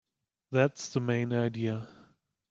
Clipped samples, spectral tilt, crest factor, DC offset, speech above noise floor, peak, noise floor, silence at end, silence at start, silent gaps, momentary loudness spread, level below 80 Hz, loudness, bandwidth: under 0.1%; -6.5 dB/octave; 20 dB; under 0.1%; 35 dB; -12 dBFS; -64 dBFS; 0.6 s; 0.5 s; none; 8 LU; -70 dBFS; -31 LUFS; 7.8 kHz